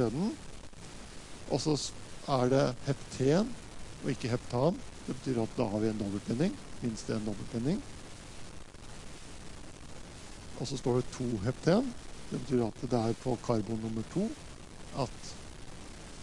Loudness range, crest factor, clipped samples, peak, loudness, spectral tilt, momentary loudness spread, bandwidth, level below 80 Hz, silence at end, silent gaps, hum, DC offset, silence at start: 8 LU; 20 dB; under 0.1%; -14 dBFS; -33 LUFS; -6 dB/octave; 19 LU; 11.5 kHz; -52 dBFS; 0 s; none; none; under 0.1%; 0 s